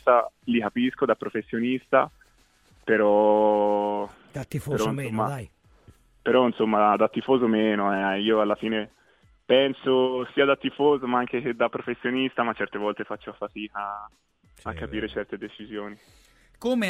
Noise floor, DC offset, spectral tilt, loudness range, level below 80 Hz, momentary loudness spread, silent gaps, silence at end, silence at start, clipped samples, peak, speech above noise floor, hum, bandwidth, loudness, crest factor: -61 dBFS; under 0.1%; -6 dB/octave; 9 LU; -58 dBFS; 15 LU; none; 0 s; 0.05 s; under 0.1%; -6 dBFS; 36 dB; none; 14 kHz; -24 LUFS; 20 dB